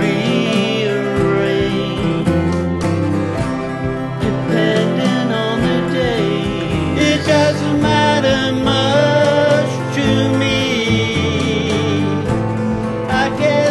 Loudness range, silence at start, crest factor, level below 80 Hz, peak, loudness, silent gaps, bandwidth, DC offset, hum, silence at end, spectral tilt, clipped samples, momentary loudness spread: 3 LU; 0 s; 14 dB; -34 dBFS; -2 dBFS; -16 LUFS; none; 12.5 kHz; 0.2%; none; 0 s; -6 dB/octave; under 0.1%; 6 LU